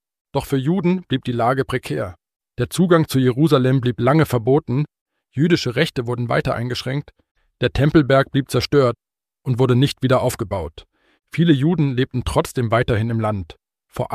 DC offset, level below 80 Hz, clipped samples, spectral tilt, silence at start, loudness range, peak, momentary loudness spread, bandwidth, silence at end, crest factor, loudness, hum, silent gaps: under 0.1%; -42 dBFS; under 0.1%; -6.5 dB/octave; 0.35 s; 2 LU; -2 dBFS; 11 LU; 15 kHz; 0 s; 16 dB; -19 LUFS; none; 2.36-2.40 s, 5.01-5.06 s, 7.31-7.35 s